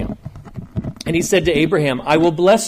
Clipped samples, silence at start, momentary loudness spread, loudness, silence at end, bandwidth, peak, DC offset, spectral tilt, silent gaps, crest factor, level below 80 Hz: under 0.1%; 0 s; 18 LU; -16 LUFS; 0 s; 15.5 kHz; -2 dBFS; under 0.1%; -5 dB/octave; none; 14 dB; -38 dBFS